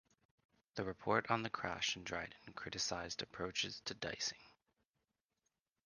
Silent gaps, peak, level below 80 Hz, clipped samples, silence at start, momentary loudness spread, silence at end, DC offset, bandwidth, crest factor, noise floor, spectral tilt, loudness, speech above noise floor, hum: none; -18 dBFS; -70 dBFS; under 0.1%; 0.75 s; 10 LU; 1.35 s; under 0.1%; 10 kHz; 26 dB; -89 dBFS; -2.5 dB/octave; -41 LUFS; 47 dB; none